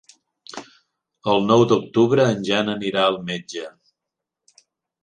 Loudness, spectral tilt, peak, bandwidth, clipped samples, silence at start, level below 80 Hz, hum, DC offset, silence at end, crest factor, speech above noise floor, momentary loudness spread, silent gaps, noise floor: -19 LUFS; -5.5 dB/octave; -2 dBFS; 9.8 kHz; under 0.1%; 0.55 s; -62 dBFS; none; under 0.1%; 1.35 s; 20 dB; 65 dB; 21 LU; none; -84 dBFS